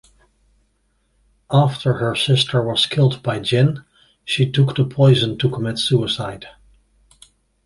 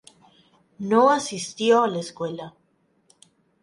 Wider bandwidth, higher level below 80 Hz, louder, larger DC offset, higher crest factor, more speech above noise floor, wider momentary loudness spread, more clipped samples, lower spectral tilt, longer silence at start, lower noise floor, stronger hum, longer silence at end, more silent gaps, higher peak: about the same, 11.5 kHz vs 11.5 kHz; first, -52 dBFS vs -72 dBFS; first, -18 LUFS vs -22 LUFS; neither; about the same, 16 dB vs 18 dB; about the same, 47 dB vs 44 dB; second, 9 LU vs 17 LU; neither; first, -6 dB/octave vs -4.5 dB/octave; first, 1.5 s vs 0.8 s; about the same, -65 dBFS vs -66 dBFS; neither; about the same, 1.15 s vs 1.15 s; neither; first, -2 dBFS vs -8 dBFS